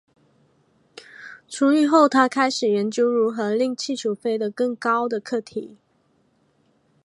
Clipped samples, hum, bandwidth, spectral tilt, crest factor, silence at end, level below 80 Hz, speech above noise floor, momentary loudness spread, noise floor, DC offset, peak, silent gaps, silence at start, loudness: under 0.1%; none; 11.5 kHz; -4.5 dB/octave; 20 dB; 1.4 s; -76 dBFS; 43 dB; 18 LU; -64 dBFS; under 0.1%; -2 dBFS; none; 1.2 s; -21 LUFS